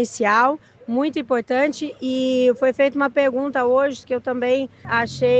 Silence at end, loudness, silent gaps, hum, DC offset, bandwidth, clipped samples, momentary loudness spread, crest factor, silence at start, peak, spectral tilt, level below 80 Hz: 0 s; -20 LUFS; none; none; under 0.1%; 8.4 kHz; under 0.1%; 7 LU; 16 dB; 0 s; -4 dBFS; -5 dB/octave; -62 dBFS